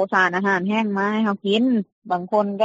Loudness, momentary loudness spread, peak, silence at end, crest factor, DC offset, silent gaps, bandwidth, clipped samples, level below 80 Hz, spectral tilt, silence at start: -21 LUFS; 6 LU; -6 dBFS; 0 s; 16 dB; under 0.1%; 1.92-2.02 s; 7.8 kHz; under 0.1%; -70 dBFS; -3.5 dB/octave; 0 s